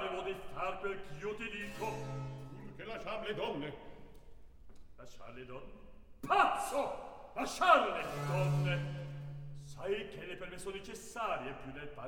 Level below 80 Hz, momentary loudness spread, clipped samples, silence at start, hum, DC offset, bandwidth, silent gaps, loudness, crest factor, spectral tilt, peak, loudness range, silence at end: -58 dBFS; 20 LU; under 0.1%; 0 s; none; 0.1%; 18 kHz; none; -37 LUFS; 24 dB; -5 dB/octave; -12 dBFS; 12 LU; 0 s